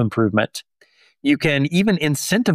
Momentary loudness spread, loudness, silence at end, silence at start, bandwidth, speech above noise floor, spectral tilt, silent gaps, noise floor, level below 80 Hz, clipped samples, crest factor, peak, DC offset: 8 LU; -19 LUFS; 0 s; 0 s; 15.5 kHz; 39 dB; -5 dB/octave; none; -57 dBFS; -54 dBFS; under 0.1%; 14 dB; -4 dBFS; under 0.1%